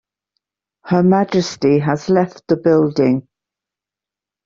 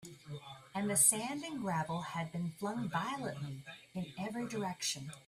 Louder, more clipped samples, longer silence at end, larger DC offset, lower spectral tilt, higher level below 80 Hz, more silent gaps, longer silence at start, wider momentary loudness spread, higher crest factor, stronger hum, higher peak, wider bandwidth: first, -16 LUFS vs -36 LUFS; neither; first, 1.25 s vs 0.05 s; neither; first, -7 dB/octave vs -3.5 dB/octave; first, -56 dBFS vs -74 dBFS; neither; first, 0.85 s vs 0 s; second, 5 LU vs 19 LU; second, 16 dB vs 26 dB; first, 50 Hz at -50 dBFS vs none; first, -2 dBFS vs -12 dBFS; second, 7.6 kHz vs 15.5 kHz